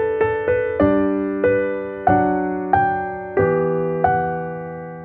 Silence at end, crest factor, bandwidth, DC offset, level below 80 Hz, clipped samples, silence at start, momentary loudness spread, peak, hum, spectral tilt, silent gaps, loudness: 0 s; 16 dB; 4.2 kHz; under 0.1%; -44 dBFS; under 0.1%; 0 s; 7 LU; -2 dBFS; none; -11 dB/octave; none; -19 LUFS